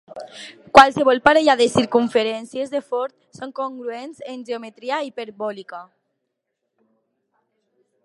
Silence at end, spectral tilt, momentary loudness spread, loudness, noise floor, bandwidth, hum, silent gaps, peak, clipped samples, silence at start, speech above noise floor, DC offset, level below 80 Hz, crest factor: 2.2 s; -4 dB/octave; 22 LU; -18 LUFS; -78 dBFS; 11.5 kHz; none; none; 0 dBFS; under 0.1%; 0.15 s; 58 dB; under 0.1%; -56 dBFS; 20 dB